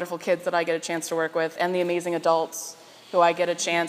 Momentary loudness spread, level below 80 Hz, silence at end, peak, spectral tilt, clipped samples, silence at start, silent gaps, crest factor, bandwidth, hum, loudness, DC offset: 6 LU; -88 dBFS; 0 s; -6 dBFS; -3.5 dB/octave; under 0.1%; 0 s; none; 18 dB; 15.5 kHz; none; -25 LUFS; under 0.1%